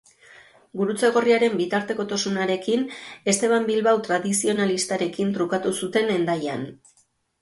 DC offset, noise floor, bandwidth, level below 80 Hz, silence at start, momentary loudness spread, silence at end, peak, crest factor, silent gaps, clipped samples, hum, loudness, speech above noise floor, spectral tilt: under 0.1%; -64 dBFS; 12 kHz; -68 dBFS; 0.75 s; 7 LU; 0.65 s; -6 dBFS; 16 dB; none; under 0.1%; none; -23 LUFS; 42 dB; -4 dB/octave